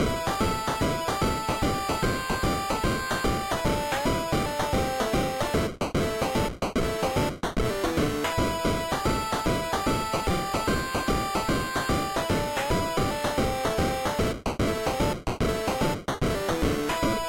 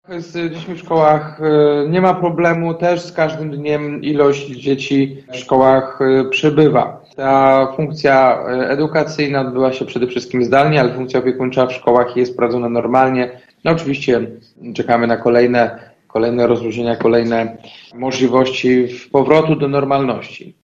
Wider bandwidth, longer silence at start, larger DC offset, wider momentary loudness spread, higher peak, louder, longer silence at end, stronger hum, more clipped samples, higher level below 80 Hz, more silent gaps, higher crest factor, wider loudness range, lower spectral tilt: first, 16.5 kHz vs 7.8 kHz; about the same, 0 s vs 0.1 s; neither; second, 1 LU vs 10 LU; second, -16 dBFS vs 0 dBFS; second, -27 LUFS vs -15 LUFS; second, 0 s vs 0.15 s; neither; neither; first, -38 dBFS vs -52 dBFS; neither; about the same, 10 dB vs 14 dB; about the same, 1 LU vs 3 LU; second, -5 dB/octave vs -6.5 dB/octave